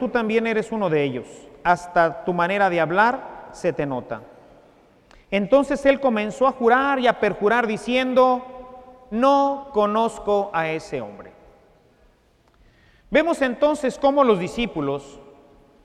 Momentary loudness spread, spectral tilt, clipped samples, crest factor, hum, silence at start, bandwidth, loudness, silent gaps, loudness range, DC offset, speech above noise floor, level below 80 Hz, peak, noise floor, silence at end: 13 LU; -5.5 dB/octave; under 0.1%; 18 dB; none; 0 s; 11.5 kHz; -21 LUFS; none; 6 LU; under 0.1%; 38 dB; -52 dBFS; -2 dBFS; -59 dBFS; 0.6 s